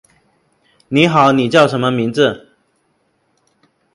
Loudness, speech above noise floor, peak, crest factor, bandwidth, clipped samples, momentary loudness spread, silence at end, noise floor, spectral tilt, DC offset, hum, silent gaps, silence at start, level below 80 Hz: -13 LUFS; 50 dB; 0 dBFS; 16 dB; 11.5 kHz; under 0.1%; 7 LU; 1.55 s; -62 dBFS; -6 dB/octave; under 0.1%; none; none; 0.9 s; -58 dBFS